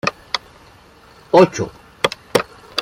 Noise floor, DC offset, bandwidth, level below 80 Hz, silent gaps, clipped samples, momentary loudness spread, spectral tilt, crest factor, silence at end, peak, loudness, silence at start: -46 dBFS; under 0.1%; 16.5 kHz; -52 dBFS; none; under 0.1%; 13 LU; -4.5 dB/octave; 18 dB; 0 s; -2 dBFS; -18 LUFS; 0.05 s